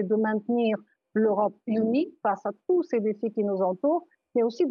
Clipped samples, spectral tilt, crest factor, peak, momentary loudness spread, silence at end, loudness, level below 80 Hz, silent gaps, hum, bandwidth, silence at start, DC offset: under 0.1%; -8.5 dB/octave; 14 dB; -12 dBFS; 5 LU; 0 s; -27 LUFS; -80 dBFS; none; none; 6.8 kHz; 0 s; under 0.1%